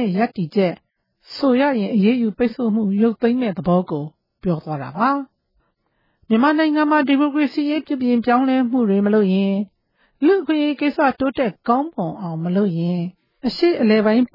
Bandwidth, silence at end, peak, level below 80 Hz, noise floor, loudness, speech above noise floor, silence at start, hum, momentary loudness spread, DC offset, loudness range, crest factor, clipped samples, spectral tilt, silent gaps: 5.8 kHz; 0.1 s; -4 dBFS; -56 dBFS; -67 dBFS; -19 LUFS; 50 dB; 0 s; none; 10 LU; under 0.1%; 4 LU; 14 dB; under 0.1%; -9 dB/octave; none